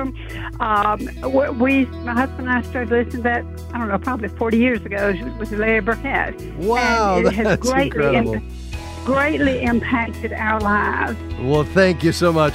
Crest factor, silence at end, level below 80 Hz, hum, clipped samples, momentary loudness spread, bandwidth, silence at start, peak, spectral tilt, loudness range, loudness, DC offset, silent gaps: 16 dB; 0 s; -34 dBFS; none; under 0.1%; 9 LU; 16 kHz; 0 s; -2 dBFS; -6 dB/octave; 2 LU; -19 LUFS; under 0.1%; none